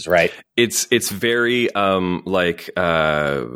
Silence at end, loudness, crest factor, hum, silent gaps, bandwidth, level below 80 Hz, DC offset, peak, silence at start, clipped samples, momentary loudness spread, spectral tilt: 0 s; -18 LUFS; 18 dB; none; none; 18 kHz; -48 dBFS; under 0.1%; 0 dBFS; 0 s; under 0.1%; 4 LU; -3.5 dB/octave